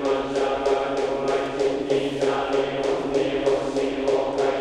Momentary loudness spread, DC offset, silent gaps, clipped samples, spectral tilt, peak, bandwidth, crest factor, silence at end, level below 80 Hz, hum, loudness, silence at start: 2 LU; under 0.1%; none; under 0.1%; -5 dB/octave; -10 dBFS; 10.5 kHz; 14 dB; 0 s; -50 dBFS; none; -24 LUFS; 0 s